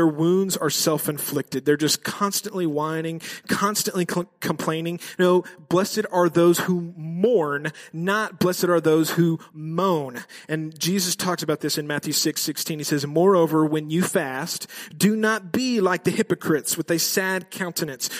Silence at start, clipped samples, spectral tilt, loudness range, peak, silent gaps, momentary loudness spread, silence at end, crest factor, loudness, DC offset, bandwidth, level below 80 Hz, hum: 0 s; under 0.1%; -4.5 dB/octave; 2 LU; -6 dBFS; none; 9 LU; 0 s; 16 dB; -23 LUFS; under 0.1%; 15.5 kHz; -68 dBFS; none